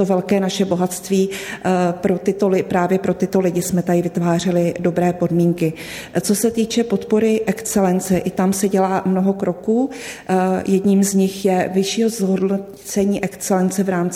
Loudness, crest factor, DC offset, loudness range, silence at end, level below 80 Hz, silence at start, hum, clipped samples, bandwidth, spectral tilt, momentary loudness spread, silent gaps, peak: -18 LUFS; 12 dB; under 0.1%; 1 LU; 0 s; -52 dBFS; 0 s; none; under 0.1%; 16 kHz; -6 dB/octave; 4 LU; none; -4 dBFS